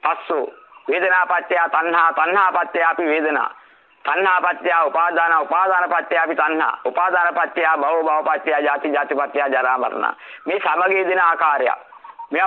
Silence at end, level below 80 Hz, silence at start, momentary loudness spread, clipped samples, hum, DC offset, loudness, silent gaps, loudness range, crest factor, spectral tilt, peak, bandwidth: 0 s; -78 dBFS; 0 s; 8 LU; under 0.1%; none; under 0.1%; -18 LUFS; none; 2 LU; 16 dB; -5 dB/octave; -4 dBFS; 6.6 kHz